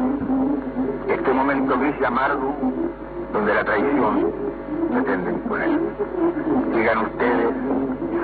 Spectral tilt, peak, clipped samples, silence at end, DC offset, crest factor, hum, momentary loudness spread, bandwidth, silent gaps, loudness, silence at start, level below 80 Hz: -10.5 dB/octave; -6 dBFS; under 0.1%; 0 s; under 0.1%; 14 dB; none; 6 LU; 4.7 kHz; none; -22 LUFS; 0 s; -44 dBFS